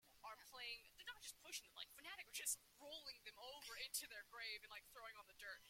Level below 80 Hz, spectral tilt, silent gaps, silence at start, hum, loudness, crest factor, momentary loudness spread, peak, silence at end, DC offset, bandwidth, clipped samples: -82 dBFS; 1.5 dB/octave; none; 0.05 s; none; -53 LUFS; 26 dB; 11 LU; -30 dBFS; 0 s; under 0.1%; 16.5 kHz; under 0.1%